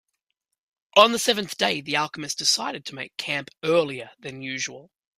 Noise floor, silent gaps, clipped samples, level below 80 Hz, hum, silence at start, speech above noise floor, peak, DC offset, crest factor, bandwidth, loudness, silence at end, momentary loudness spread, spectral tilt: -81 dBFS; none; under 0.1%; -70 dBFS; none; 0.95 s; 56 dB; 0 dBFS; under 0.1%; 24 dB; 15.5 kHz; -23 LUFS; 0.35 s; 16 LU; -2 dB/octave